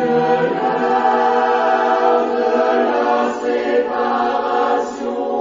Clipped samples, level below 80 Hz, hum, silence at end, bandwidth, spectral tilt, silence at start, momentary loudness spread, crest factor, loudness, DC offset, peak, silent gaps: under 0.1%; -58 dBFS; none; 0 s; 7.6 kHz; -5.5 dB/octave; 0 s; 4 LU; 12 dB; -17 LUFS; under 0.1%; -4 dBFS; none